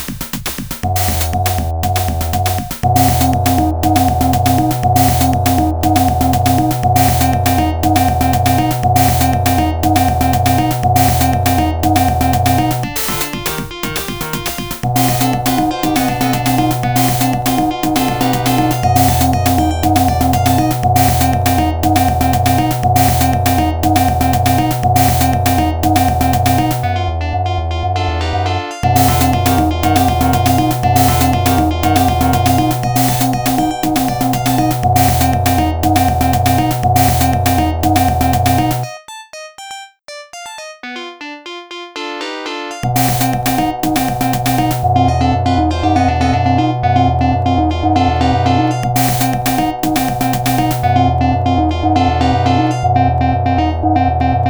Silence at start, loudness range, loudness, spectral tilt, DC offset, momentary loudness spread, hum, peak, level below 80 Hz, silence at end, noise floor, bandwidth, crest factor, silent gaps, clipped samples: 0 s; 4 LU; -14 LUFS; -5.5 dB/octave; 2%; 8 LU; none; 0 dBFS; -26 dBFS; 0 s; -34 dBFS; over 20 kHz; 14 dB; none; under 0.1%